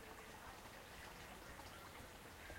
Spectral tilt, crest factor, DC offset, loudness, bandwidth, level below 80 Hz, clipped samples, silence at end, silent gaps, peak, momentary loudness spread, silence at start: -3.5 dB/octave; 16 dB; under 0.1%; -56 LUFS; 16.5 kHz; -66 dBFS; under 0.1%; 0 s; none; -40 dBFS; 1 LU; 0 s